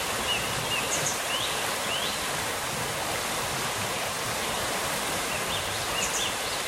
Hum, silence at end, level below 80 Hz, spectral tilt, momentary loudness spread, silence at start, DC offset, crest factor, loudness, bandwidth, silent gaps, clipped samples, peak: none; 0 s; -52 dBFS; -1.5 dB/octave; 3 LU; 0 s; under 0.1%; 16 dB; -27 LUFS; 16 kHz; none; under 0.1%; -14 dBFS